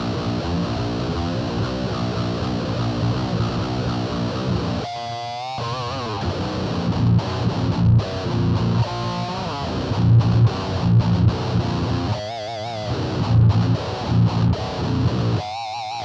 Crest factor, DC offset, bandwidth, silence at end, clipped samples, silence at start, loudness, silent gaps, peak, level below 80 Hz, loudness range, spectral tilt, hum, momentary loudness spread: 14 dB; under 0.1%; 7.6 kHz; 0 s; under 0.1%; 0 s; -22 LUFS; none; -6 dBFS; -36 dBFS; 4 LU; -7.5 dB/octave; none; 9 LU